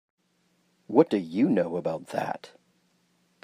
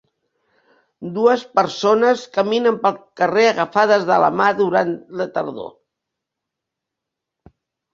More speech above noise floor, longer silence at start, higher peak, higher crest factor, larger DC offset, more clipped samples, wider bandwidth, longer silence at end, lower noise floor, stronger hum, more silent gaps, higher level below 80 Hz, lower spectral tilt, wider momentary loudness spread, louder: second, 44 dB vs 65 dB; about the same, 0.9 s vs 1 s; second, -6 dBFS vs -2 dBFS; about the same, 22 dB vs 18 dB; neither; neither; first, 15.5 kHz vs 7.6 kHz; second, 1 s vs 2.25 s; second, -70 dBFS vs -83 dBFS; neither; neither; second, -78 dBFS vs -66 dBFS; first, -7.5 dB/octave vs -5 dB/octave; about the same, 10 LU vs 11 LU; second, -26 LUFS vs -17 LUFS